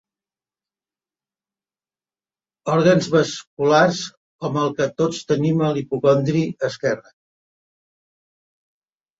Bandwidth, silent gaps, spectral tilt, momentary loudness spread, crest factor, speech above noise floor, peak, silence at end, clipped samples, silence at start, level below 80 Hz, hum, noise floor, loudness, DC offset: 7.8 kHz; 3.47-3.57 s, 4.17-4.39 s; -6 dB/octave; 11 LU; 20 dB; over 71 dB; -2 dBFS; 2.2 s; under 0.1%; 2.65 s; -62 dBFS; none; under -90 dBFS; -20 LUFS; under 0.1%